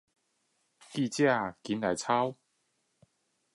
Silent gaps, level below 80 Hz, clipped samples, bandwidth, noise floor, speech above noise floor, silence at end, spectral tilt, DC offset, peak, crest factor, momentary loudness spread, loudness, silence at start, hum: none; -72 dBFS; under 0.1%; 11.5 kHz; -77 dBFS; 47 dB; 1.2 s; -5 dB/octave; under 0.1%; -14 dBFS; 20 dB; 8 LU; -30 LUFS; 0.9 s; none